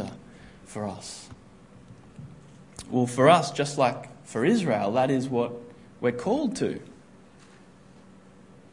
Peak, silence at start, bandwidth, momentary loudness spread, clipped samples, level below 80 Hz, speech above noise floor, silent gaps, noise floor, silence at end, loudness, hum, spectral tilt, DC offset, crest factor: -4 dBFS; 0 s; 11 kHz; 25 LU; under 0.1%; -62 dBFS; 28 dB; none; -52 dBFS; 1.8 s; -25 LUFS; none; -5.5 dB/octave; under 0.1%; 24 dB